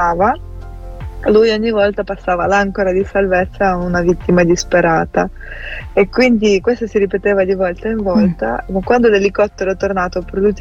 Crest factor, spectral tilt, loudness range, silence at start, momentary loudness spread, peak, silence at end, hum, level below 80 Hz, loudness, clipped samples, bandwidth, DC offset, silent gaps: 14 dB; -6 dB/octave; 1 LU; 0 s; 9 LU; 0 dBFS; 0 s; none; -32 dBFS; -15 LUFS; under 0.1%; 7.8 kHz; under 0.1%; none